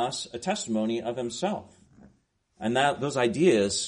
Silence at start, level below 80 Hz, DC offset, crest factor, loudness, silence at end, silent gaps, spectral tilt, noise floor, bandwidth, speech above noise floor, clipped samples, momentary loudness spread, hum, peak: 0 s; -64 dBFS; under 0.1%; 18 dB; -27 LUFS; 0 s; none; -4 dB/octave; -67 dBFS; 10.5 kHz; 41 dB; under 0.1%; 10 LU; none; -10 dBFS